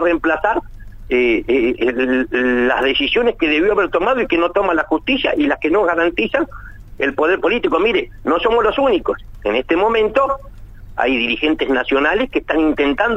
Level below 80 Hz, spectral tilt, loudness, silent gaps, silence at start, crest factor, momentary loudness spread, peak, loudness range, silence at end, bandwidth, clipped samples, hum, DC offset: -38 dBFS; -6 dB/octave; -16 LUFS; none; 0 s; 14 dB; 5 LU; -2 dBFS; 2 LU; 0 s; 8.2 kHz; under 0.1%; none; under 0.1%